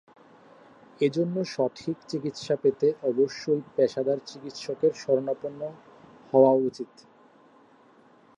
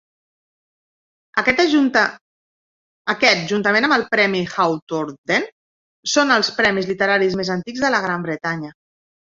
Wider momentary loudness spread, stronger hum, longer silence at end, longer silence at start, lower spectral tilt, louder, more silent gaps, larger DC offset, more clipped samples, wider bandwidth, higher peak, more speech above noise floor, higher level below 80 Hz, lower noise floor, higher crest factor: first, 15 LU vs 10 LU; neither; first, 1.55 s vs 0.65 s; second, 1 s vs 1.35 s; first, -6.5 dB/octave vs -4 dB/octave; second, -26 LUFS vs -18 LUFS; second, none vs 2.21-3.05 s, 4.82-4.87 s, 5.18-5.24 s, 5.52-6.03 s; neither; neither; first, 9.6 kHz vs 7.8 kHz; second, -6 dBFS vs 0 dBFS; second, 31 dB vs over 72 dB; second, -76 dBFS vs -58 dBFS; second, -57 dBFS vs under -90 dBFS; about the same, 22 dB vs 20 dB